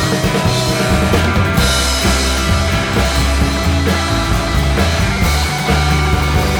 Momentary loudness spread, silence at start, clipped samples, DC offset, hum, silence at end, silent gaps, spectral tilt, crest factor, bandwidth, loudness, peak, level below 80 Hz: 2 LU; 0 s; under 0.1%; under 0.1%; none; 0 s; none; -4.5 dB/octave; 12 dB; over 20 kHz; -14 LUFS; 0 dBFS; -20 dBFS